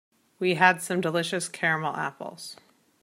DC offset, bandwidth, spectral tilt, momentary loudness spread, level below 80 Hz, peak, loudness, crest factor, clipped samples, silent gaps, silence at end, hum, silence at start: under 0.1%; 16 kHz; -4 dB/octave; 18 LU; -76 dBFS; -4 dBFS; -25 LUFS; 24 dB; under 0.1%; none; 0.5 s; none; 0.4 s